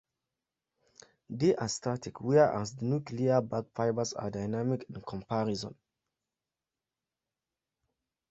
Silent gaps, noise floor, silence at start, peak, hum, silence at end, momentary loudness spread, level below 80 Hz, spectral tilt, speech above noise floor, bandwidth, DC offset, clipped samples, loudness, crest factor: none; under -90 dBFS; 1.3 s; -12 dBFS; none; 2.6 s; 11 LU; -66 dBFS; -6 dB/octave; over 59 dB; 8.2 kHz; under 0.1%; under 0.1%; -31 LUFS; 22 dB